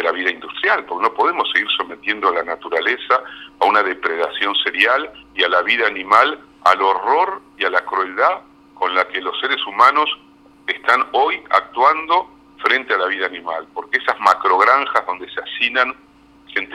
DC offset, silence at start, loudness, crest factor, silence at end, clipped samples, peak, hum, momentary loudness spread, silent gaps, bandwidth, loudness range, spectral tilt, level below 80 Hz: under 0.1%; 0 s; -17 LUFS; 18 dB; 0 s; under 0.1%; 0 dBFS; none; 10 LU; none; 14 kHz; 2 LU; -2.5 dB/octave; -62 dBFS